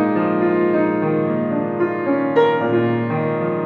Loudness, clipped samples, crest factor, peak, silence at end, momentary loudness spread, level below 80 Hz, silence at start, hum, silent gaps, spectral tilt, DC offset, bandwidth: -18 LUFS; under 0.1%; 14 dB; -2 dBFS; 0 s; 4 LU; -62 dBFS; 0 s; none; none; -9.5 dB/octave; under 0.1%; 4.6 kHz